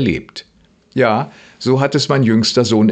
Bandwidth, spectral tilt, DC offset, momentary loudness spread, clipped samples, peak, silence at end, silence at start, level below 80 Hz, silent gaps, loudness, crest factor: 8.8 kHz; -5.5 dB/octave; under 0.1%; 15 LU; under 0.1%; 0 dBFS; 0 s; 0 s; -48 dBFS; none; -15 LUFS; 16 dB